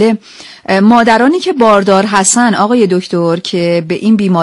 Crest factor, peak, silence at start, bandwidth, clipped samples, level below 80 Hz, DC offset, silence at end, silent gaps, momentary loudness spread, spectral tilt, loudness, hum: 10 dB; 0 dBFS; 0 s; 11.5 kHz; 0.1%; -50 dBFS; under 0.1%; 0 s; none; 6 LU; -4.5 dB/octave; -10 LUFS; none